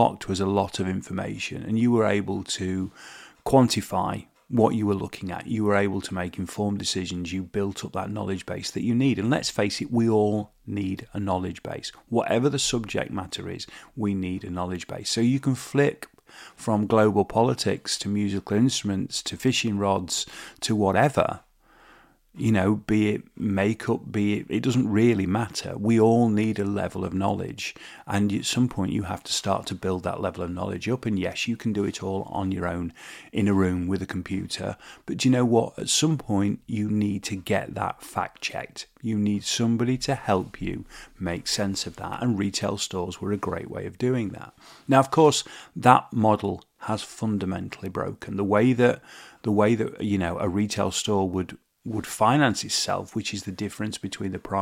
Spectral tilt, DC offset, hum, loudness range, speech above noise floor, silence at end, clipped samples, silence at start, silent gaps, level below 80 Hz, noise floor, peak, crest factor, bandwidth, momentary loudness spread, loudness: -5 dB/octave; under 0.1%; none; 4 LU; 31 dB; 0 s; under 0.1%; 0 s; none; -54 dBFS; -56 dBFS; 0 dBFS; 24 dB; 16 kHz; 12 LU; -25 LUFS